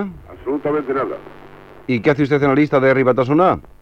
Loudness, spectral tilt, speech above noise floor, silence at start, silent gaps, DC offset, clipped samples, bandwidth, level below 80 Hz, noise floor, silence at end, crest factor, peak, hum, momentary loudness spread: -17 LUFS; -8.5 dB/octave; 24 dB; 0 s; none; under 0.1%; under 0.1%; 7 kHz; -48 dBFS; -40 dBFS; 0.2 s; 14 dB; -2 dBFS; none; 15 LU